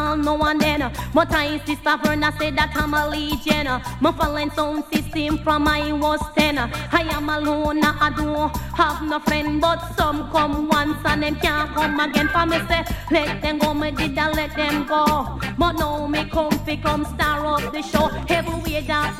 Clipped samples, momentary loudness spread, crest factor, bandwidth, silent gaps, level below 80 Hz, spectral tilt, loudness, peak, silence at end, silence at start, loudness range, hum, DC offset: under 0.1%; 4 LU; 20 dB; 16.5 kHz; none; -34 dBFS; -5 dB/octave; -21 LUFS; 0 dBFS; 0 s; 0 s; 1 LU; none; under 0.1%